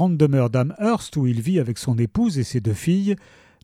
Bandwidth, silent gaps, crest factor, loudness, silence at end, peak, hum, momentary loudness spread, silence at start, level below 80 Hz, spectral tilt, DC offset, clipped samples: 14.5 kHz; none; 16 dB; -21 LUFS; 0.45 s; -4 dBFS; none; 5 LU; 0 s; -50 dBFS; -7.5 dB/octave; under 0.1%; under 0.1%